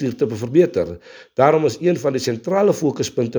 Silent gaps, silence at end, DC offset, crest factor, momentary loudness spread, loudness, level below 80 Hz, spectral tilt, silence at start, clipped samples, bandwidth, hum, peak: none; 0 s; under 0.1%; 18 dB; 9 LU; -19 LUFS; -56 dBFS; -6 dB/octave; 0 s; under 0.1%; over 20 kHz; none; 0 dBFS